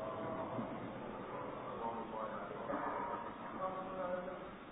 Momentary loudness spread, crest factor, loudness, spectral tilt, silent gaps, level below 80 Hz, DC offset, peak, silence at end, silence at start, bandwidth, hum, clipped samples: 5 LU; 16 dB; -44 LUFS; -2.5 dB/octave; none; -68 dBFS; under 0.1%; -28 dBFS; 0 s; 0 s; 3.8 kHz; none; under 0.1%